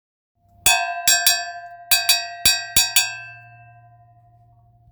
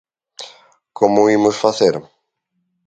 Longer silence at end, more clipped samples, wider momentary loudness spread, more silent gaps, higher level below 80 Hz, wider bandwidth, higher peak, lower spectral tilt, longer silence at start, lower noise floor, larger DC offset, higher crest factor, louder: first, 1.5 s vs 0.85 s; neither; second, 18 LU vs 22 LU; neither; first, -50 dBFS vs -60 dBFS; first, over 20 kHz vs 9 kHz; about the same, 0 dBFS vs 0 dBFS; second, 1.5 dB/octave vs -5 dB/octave; first, 0.65 s vs 0.4 s; second, -54 dBFS vs -71 dBFS; neither; about the same, 22 dB vs 18 dB; about the same, -17 LUFS vs -15 LUFS